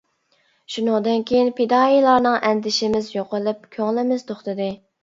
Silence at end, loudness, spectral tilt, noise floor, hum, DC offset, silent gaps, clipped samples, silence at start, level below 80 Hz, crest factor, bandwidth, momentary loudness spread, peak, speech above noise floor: 0.3 s; -20 LUFS; -4.5 dB/octave; -64 dBFS; none; under 0.1%; none; under 0.1%; 0.7 s; -60 dBFS; 18 dB; 7.8 kHz; 11 LU; -2 dBFS; 45 dB